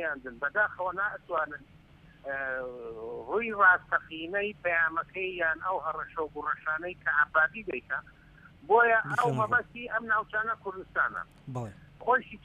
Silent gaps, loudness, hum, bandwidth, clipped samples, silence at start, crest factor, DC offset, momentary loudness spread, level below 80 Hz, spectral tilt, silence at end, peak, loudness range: none; -29 LUFS; none; 11.5 kHz; under 0.1%; 0 s; 20 dB; under 0.1%; 15 LU; -62 dBFS; -6 dB/octave; 0.05 s; -10 dBFS; 3 LU